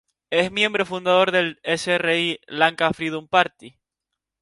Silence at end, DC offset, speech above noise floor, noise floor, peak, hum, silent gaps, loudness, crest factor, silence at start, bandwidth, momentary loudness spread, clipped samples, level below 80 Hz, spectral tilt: 0.7 s; under 0.1%; 62 dB; -84 dBFS; 0 dBFS; none; none; -21 LUFS; 22 dB; 0.3 s; 11.5 kHz; 6 LU; under 0.1%; -62 dBFS; -4 dB/octave